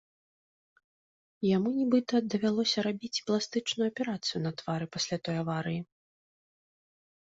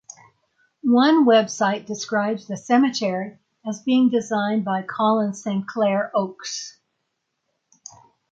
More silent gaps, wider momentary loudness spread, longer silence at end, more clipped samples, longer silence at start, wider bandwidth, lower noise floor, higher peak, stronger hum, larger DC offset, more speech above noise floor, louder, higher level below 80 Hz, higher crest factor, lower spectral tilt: neither; second, 7 LU vs 14 LU; second, 1.45 s vs 1.6 s; neither; first, 1.4 s vs 0.85 s; about the same, 8 kHz vs 7.8 kHz; first, under -90 dBFS vs -76 dBFS; second, -14 dBFS vs -6 dBFS; neither; neither; first, over 60 dB vs 56 dB; second, -31 LUFS vs -21 LUFS; about the same, -72 dBFS vs -72 dBFS; about the same, 18 dB vs 16 dB; about the same, -5 dB/octave vs -5 dB/octave